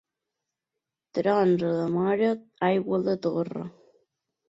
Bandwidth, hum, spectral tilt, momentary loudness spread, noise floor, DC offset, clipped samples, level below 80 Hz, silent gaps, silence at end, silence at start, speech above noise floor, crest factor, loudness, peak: 7.8 kHz; none; -8.5 dB/octave; 11 LU; -87 dBFS; under 0.1%; under 0.1%; -70 dBFS; none; 0.8 s; 1.15 s; 62 dB; 16 dB; -26 LUFS; -10 dBFS